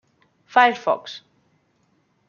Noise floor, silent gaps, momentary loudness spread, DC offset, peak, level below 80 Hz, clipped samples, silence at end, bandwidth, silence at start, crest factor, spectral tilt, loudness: -65 dBFS; none; 21 LU; under 0.1%; -2 dBFS; -80 dBFS; under 0.1%; 1.1 s; 7 kHz; 0.55 s; 22 dB; -3.5 dB/octave; -19 LUFS